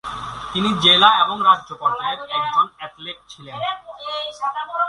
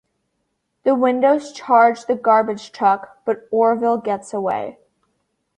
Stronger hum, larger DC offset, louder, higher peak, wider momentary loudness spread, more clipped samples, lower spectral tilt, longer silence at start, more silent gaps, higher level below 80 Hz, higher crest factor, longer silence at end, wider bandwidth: neither; neither; about the same, -18 LUFS vs -18 LUFS; about the same, 0 dBFS vs -2 dBFS; first, 21 LU vs 11 LU; neither; second, -3.5 dB/octave vs -5.5 dB/octave; second, 0.05 s vs 0.85 s; neither; first, -54 dBFS vs -68 dBFS; about the same, 20 dB vs 16 dB; second, 0 s vs 0.85 s; first, 11.5 kHz vs 10 kHz